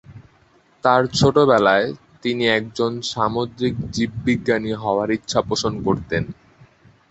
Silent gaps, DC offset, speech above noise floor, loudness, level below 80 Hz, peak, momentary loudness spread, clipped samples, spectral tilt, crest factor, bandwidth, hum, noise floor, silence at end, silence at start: none; under 0.1%; 37 dB; -20 LUFS; -46 dBFS; -2 dBFS; 9 LU; under 0.1%; -5 dB/octave; 20 dB; 8.2 kHz; none; -56 dBFS; 0.8 s; 0.1 s